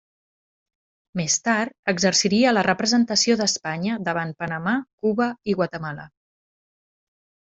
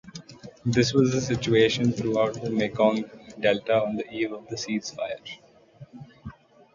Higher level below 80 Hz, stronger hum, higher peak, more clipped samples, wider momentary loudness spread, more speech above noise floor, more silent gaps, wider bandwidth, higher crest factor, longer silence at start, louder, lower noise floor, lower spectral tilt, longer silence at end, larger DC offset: second, -62 dBFS vs -56 dBFS; neither; about the same, -4 dBFS vs -6 dBFS; neither; second, 10 LU vs 23 LU; first, over 68 dB vs 25 dB; first, 1.79-1.83 s, 4.93-4.98 s vs none; about the same, 8.2 kHz vs 7.6 kHz; about the same, 20 dB vs 20 dB; first, 1.15 s vs 0.05 s; first, -22 LUFS vs -25 LUFS; first, under -90 dBFS vs -50 dBFS; second, -3.5 dB/octave vs -5.5 dB/octave; first, 1.35 s vs 0.45 s; neither